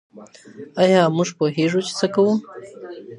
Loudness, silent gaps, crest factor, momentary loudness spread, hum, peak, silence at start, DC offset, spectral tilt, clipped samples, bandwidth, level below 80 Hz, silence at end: -19 LUFS; none; 18 dB; 21 LU; none; -2 dBFS; 0.15 s; under 0.1%; -5.5 dB/octave; under 0.1%; 11 kHz; -70 dBFS; 0 s